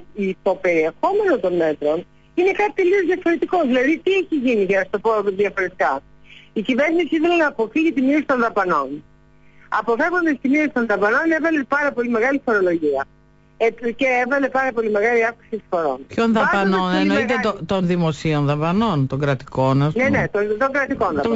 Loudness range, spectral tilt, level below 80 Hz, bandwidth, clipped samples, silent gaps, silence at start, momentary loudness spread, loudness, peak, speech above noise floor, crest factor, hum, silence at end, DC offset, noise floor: 1 LU; -7 dB/octave; -52 dBFS; 8 kHz; under 0.1%; none; 0 s; 5 LU; -19 LUFS; -8 dBFS; 31 dB; 10 dB; none; 0 s; under 0.1%; -49 dBFS